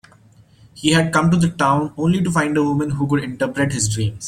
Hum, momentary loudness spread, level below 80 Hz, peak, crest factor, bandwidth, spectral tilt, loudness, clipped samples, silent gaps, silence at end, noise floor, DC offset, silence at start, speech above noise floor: none; 5 LU; -46 dBFS; 0 dBFS; 18 dB; 14.5 kHz; -5 dB/octave; -18 LUFS; under 0.1%; none; 0 s; -50 dBFS; under 0.1%; 0.75 s; 32 dB